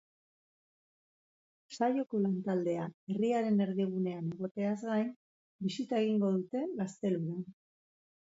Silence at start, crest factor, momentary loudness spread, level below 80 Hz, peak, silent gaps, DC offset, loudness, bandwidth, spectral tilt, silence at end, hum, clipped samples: 1.7 s; 16 dB; 9 LU; -80 dBFS; -18 dBFS; 2.94-3.07 s, 4.51-4.55 s, 5.16-5.59 s; under 0.1%; -34 LUFS; 7.8 kHz; -7.5 dB/octave; 0.85 s; none; under 0.1%